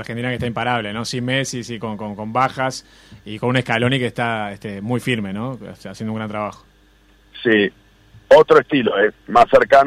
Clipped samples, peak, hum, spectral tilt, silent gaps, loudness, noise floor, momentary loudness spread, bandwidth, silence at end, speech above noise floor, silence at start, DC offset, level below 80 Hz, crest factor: under 0.1%; -2 dBFS; none; -5.5 dB/octave; none; -18 LUFS; -53 dBFS; 15 LU; 14 kHz; 0 s; 34 dB; 0 s; under 0.1%; -50 dBFS; 16 dB